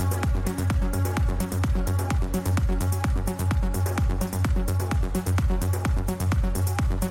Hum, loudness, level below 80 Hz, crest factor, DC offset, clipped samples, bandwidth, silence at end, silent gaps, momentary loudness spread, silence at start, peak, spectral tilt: none; -26 LUFS; -28 dBFS; 12 dB; under 0.1%; under 0.1%; 16.5 kHz; 0 s; none; 1 LU; 0 s; -12 dBFS; -6 dB/octave